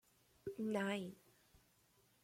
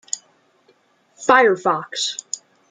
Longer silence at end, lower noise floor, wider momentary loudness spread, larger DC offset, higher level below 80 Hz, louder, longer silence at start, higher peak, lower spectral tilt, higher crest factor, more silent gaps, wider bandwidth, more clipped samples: first, 1.1 s vs 0.35 s; first, -75 dBFS vs -59 dBFS; second, 13 LU vs 16 LU; neither; second, -80 dBFS vs -68 dBFS; second, -44 LUFS vs -19 LUFS; first, 0.45 s vs 0.15 s; second, -28 dBFS vs -2 dBFS; first, -5.5 dB/octave vs -2 dB/octave; about the same, 18 dB vs 20 dB; neither; first, 16.5 kHz vs 9.6 kHz; neither